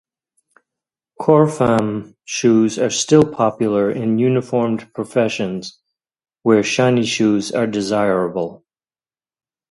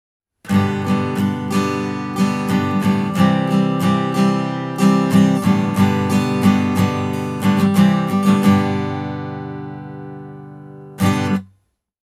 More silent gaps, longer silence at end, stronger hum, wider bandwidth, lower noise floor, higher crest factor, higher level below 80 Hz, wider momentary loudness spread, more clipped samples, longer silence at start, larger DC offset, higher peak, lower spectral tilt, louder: neither; first, 1.15 s vs 0.6 s; second, none vs 50 Hz at -35 dBFS; second, 11.5 kHz vs 15 kHz; first, under -90 dBFS vs -61 dBFS; about the same, 18 dB vs 16 dB; about the same, -56 dBFS vs -58 dBFS; second, 11 LU vs 16 LU; neither; first, 1.2 s vs 0.45 s; neither; about the same, 0 dBFS vs -2 dBFS; second, -5.5 dB/octave vs -7 dB/octave; about the same, -17 LUFS vs -17 LUFS